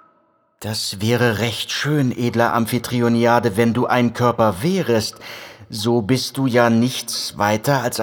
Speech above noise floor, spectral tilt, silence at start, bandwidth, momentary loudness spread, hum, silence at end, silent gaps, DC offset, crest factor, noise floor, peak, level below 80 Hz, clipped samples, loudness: 42 dB; -5 dB/octave; 0.6 s; over 20 kHz; 8 LU; none; 0 s; none; under 0.1%; 18 dB; -60 dBFS; 0 dBFS; -56 dBFS; under 0.1%; -18 LUFS